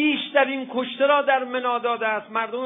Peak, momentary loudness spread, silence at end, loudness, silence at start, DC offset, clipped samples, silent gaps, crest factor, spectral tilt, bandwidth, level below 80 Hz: -4 dBFS; 7 LU; 0 s; -22 LUFS; 0 s; under 0.1%; under 0.1%; none; 18 dB; -6.5 dB/octave; 3.9 kHz; -80 dBFS